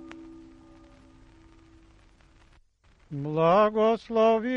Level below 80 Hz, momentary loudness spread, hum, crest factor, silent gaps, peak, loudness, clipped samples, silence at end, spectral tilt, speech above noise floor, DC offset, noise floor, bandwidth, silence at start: -60 dBFS; 24 LU; none; 18 dB; none; -10 dBFS; -24 LUFS; under 0.1%; 0 s; -7.5 dB/octave; 38 dB; under 0.1%; -61 dBFS; 7 kHz; 0 s